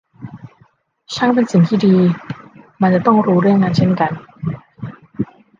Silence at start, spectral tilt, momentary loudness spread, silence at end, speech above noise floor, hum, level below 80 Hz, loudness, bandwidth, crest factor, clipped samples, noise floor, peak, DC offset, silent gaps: 0.2 s; -8 dB/octave; 20 LU; 0.35 s; 41 dB; none; -54 dBFS; -15 LUFS; 7.4 kHz; 16 dB; under 0.1%; -54 dBFS; -2 dBFS; under 0.1%; none